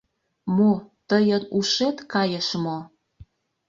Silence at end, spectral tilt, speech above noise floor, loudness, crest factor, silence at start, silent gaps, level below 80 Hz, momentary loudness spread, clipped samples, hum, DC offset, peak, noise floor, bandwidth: 0.45 s; -5 dB/octave; 29 dB; -23 LUFS; 16 dB; 0.45 s; none; -62 dBFS; 9 LU; under 0.1%; none; under 0.1%; -8 dBFS; -51 dBFS; 7.4 kHz